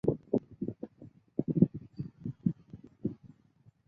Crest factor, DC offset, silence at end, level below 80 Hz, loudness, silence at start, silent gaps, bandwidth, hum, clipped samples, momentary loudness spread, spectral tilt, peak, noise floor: 26 dB; under 0.1%; 0.6 s; -62 dBFS; -35 LUFS; 0.05 s; none; 4.9 kHz; none; under 0.1%; 19 LU; -13 dB/octave; -10 dBFS; -64 dBFS